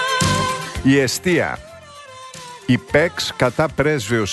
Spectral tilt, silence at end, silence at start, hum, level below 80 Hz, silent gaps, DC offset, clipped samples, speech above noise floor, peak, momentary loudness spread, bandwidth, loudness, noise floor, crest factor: -4.5 dB/octave; 0 s; 0 s; none; -42 dBFS; none; under 0.1%; under 0.1%; 21 dB; -4 dBFS; 20 LU; 12.5 kHz; -18 LUFS; -39 dBFS; 16 dB